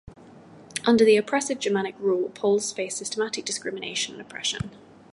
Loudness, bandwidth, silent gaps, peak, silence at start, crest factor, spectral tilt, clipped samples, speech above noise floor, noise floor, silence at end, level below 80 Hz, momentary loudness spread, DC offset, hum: -25 LUFS; 11.5 kHz; none; -8 dBFS; 0.1 s; 18 dB; -3.5 dB/octave; under 0.1%; 24 dB; -48 dBFS; 0.35 s; -58 dBFS; 11 LU; under 0.1%; none